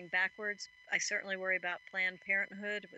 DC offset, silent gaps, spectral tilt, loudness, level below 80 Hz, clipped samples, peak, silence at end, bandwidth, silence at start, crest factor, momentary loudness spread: under 0.1%; none; -1.5 dB/octave; -35 LUFS; -86 dBFS; under 0.1%; -16 dBFS; 0 s; 8.6 kHz; 0 s; 20 dB; 7 LU